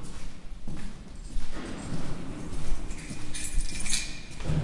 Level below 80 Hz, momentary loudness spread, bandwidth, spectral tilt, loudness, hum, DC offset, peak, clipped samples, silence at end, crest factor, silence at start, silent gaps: -34 dBFS; 14 LU; 11.5 kHz; -3.5 dB/octave; -36 LUFS; none; under 0.1%; -12 dBFS; under 0.1%; 0 s; 16 dB; 0 s; none